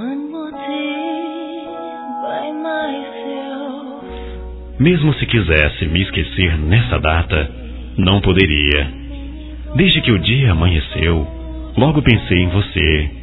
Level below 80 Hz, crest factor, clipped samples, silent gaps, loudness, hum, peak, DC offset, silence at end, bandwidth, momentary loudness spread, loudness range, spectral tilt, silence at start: -26 dBFS; 16 dB; under 0.1%; none; -16 LUFS; none; 0 dBFS; under 0.1%; 0 s; 4.1 kHz; 17 LU; 9 LU; -9.5 dB/octave; 0 s